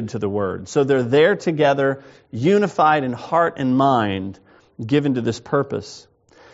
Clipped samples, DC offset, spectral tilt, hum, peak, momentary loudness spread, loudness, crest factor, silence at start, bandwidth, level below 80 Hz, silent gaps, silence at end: under 0.1%; under 0.1%; -5 dB/octave; none; -4 dBFS; 13 LU; -19 LUFS; 16 dB; 0 s; 8 kHz; -60 dBFS; none; 0.55 s